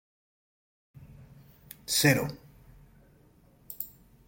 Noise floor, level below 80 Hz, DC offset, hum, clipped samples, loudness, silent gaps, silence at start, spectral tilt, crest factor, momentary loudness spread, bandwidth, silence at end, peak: -60 dBFS; -60 dBFS; under 0.1%; none; under 0.1%; -28 LUFS; none; 1.9 s; -3.5 dB/octave; 26 dB; 25 LU; 16.5 kHz; 0.4 s; -10 dBFS